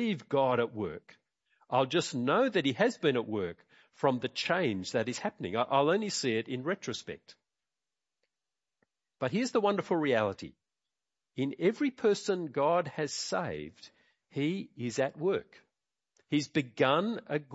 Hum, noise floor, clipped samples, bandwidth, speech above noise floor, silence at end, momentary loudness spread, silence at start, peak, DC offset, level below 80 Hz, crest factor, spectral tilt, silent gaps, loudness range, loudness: none; under -90 dBFS; under 0.1%; 8 kHz; over 59 dB; 0 s; 11 LU; 0 s; -12 dBFS; under 0.1%; -74 dBFS; 20 dB; -5 dB/octave; none; 5 LU; -31 LUFS